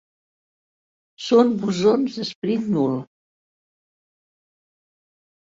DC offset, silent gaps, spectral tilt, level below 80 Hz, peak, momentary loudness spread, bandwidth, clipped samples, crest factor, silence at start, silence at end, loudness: under 0.1%; 2.35-2.42 s; -6.5 dB/octave; -66 dBFS; -4 dBFS; 10 LU; 7.8 kHz; under 0.1%; 20 dB; 1.2 s; 2.55 s; -21 LUFS